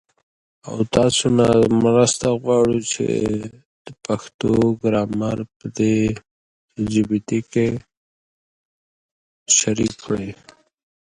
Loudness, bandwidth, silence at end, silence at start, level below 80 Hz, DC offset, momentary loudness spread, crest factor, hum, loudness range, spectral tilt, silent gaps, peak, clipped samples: -19 LUFS; 11.5 kHz; 0.65 s; 0.65 s; -48 dBFS; under 0.1%; 16 LU; 20 dB; none; 6 LU; -4.5 dB/octave; 3.66-3.85 s, 4.34-4.39 s, 5.56-5.60 s, 6.31-6.68 s, 7.97-9.46 s; 0 dBFS; under 0.1%